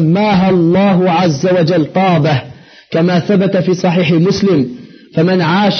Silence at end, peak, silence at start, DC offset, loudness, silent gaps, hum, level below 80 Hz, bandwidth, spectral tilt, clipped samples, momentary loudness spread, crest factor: 0 s; -2 dBFS; 0 s; under 0.1%; -12 LUFS; none; none; -48 dBFS; 6.6 kHz; -6 dB/octave; under 0.1%; 5 LU; 8 dB